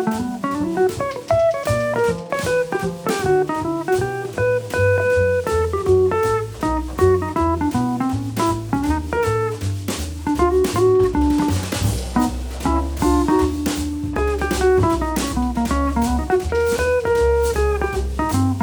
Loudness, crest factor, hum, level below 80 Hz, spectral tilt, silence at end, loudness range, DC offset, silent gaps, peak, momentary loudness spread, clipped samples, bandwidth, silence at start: -20 LUFS; 14 dB; none; -30 dBFS; -6 dB/octave; 0 s; 2 LU; under 0.1%; none; -4 dBFS; 6 LU; under 0.1%; over 20 kHz; 0 s